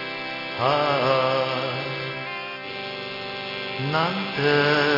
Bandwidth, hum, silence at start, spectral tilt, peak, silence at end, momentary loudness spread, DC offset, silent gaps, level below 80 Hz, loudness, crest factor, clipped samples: 5.8 kHz; none; 0 s; -6 dB/octave; -6 dBFS; 0 s; 11 LU; under 0.1%; none; -64 dBFS; -24 LUFS; 18 dB; under 0.1%